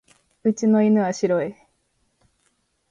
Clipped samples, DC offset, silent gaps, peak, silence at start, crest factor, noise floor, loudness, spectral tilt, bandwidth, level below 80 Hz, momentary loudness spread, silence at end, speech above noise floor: under 0.1%; under 0.1%; none; -8 dBFS; 0.45 s; 14 dB; -69 dBFS; -21 LUFS; -7 dB/octave; 7.6 kHz; -68 dBFS; 8 LU; 1.4 s; 50 dB